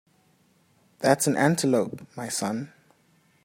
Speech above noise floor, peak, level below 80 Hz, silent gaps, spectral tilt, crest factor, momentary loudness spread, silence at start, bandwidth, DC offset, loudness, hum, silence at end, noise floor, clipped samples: 39 dB; -4 dBFS; -70 dBFS; none; -4.5 dB/octave; 22 dB; 13 LU; 1 s; 16 kHz; under 0.1%; -25 LUFS; none; 0.75 s; -64 dBFS; under 0.1%